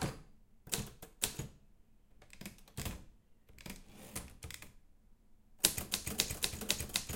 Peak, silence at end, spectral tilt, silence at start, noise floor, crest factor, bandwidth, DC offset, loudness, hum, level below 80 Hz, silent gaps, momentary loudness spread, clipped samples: -6 dBFS; 0 s; -2 dB/octave; 0 s; -63 dBFS; 36 dB; 17 kHz; under 0.1%; -37 LUFS; none; -56 dBFS; none; 19 LU; under 0.1%